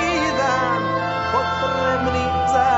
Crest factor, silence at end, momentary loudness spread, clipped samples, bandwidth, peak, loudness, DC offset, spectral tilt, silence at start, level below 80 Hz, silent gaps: 14 dB; 0 s; 2 LU; under 0.1%; 8 kHz; -6 dBFS; -20 LUFS; under 0.1%; -5 dB/octave; 0 s; -40 dBFS; none